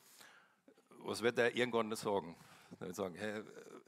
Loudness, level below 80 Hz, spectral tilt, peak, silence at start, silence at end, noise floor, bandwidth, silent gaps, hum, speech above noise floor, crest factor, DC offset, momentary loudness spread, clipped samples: -39 LUFS; -84 dBFS; -4 dB/octave; -18 dBFS; 0.15 s; 0.05 s; -69 dBFS; 16 kHz; none; none; 30 dB; 22 dB; under 0.1%; 24 LU; under 0.1%